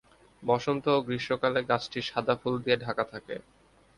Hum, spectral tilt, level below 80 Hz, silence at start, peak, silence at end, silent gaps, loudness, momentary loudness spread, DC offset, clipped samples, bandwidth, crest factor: none; -6 dB/octave; -64 dBFS; 0.4 s; -10 dBFS; 0.55 s; none; -29 LUFS; 10 LU; under 0.1%; under 0.1%; 11 kHz; 20 dB